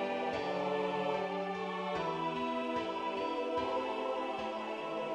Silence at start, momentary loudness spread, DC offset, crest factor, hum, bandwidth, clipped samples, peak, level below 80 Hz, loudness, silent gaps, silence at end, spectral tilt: 0 s; 4 LU; under 0.1%; 16 dB; none; 11 kHz; under 0.1%; -20 dBFS; -68 dBFS; -36 LUFS; none; 0 s; -5.5 dB/octave